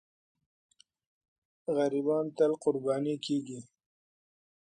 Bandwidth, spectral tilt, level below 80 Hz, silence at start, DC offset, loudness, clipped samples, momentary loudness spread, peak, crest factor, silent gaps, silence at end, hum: 9.8 kHz; -6 dB/octave; -82 dBFS; 1.7 s; under 0.1%; -31 LUFS; under 0.1%; 13 LU; -14 dBFS; 20 dB; none; 1.05 s; none